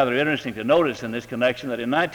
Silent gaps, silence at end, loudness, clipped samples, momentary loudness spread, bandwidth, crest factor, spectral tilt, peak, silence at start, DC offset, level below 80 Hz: none; 0 s; -23 LUFS; under 0.1%; 8 LU; over 20 kHz; 16 dB; -5.5 dB/octave; -6 dBFS; 0 s; under 0.1%; -58 dBFS